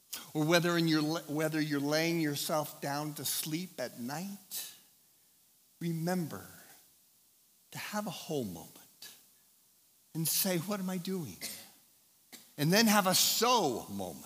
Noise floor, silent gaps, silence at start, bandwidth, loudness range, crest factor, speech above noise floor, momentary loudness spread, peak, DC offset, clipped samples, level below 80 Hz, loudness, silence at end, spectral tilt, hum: -67 dBFS; none; 0.1 s; 16 kHz; 12 LU; 24 dB; 34 dB; 20 LU; -10 dBFS; under 0.1%; under 0.1%; -82 dBFS; -32 LUFS; 0 s; -3.5 dB/octave; none